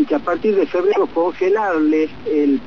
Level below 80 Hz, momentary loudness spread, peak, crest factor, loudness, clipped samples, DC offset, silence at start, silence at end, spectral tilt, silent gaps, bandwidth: -54 dBFS; 3 LU; -6 dBFS; 12 dB; -18 LUFS; under 0.1%; 1%; 0 s; 0 s; -7 dB/octave; none; 6.8 kHz